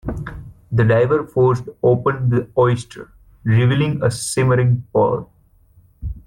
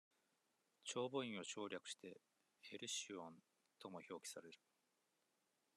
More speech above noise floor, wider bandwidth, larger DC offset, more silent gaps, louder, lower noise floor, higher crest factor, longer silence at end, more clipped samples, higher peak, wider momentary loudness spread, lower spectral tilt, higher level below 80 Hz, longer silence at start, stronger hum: about the same, 36 dB vs 35 dB; about the same, 13 kHz vs 13 kHz; neither; neither; first, -18 LUFS vs -50 LUFS; second, -52 dBFS vs -86 dBFS; second, 14 dB vs 22 dB; second, 0.05 s vs 1.2 s; neither; first, -4 dBFS vs -32 dBFS; about the same, 17 LU vs 16 LU; first, -7 dB/octave vs -2.5 dB/octave; first, -40 dBFS vs under -90 dBFS; second, 0.05 s vs 0.85 s; neither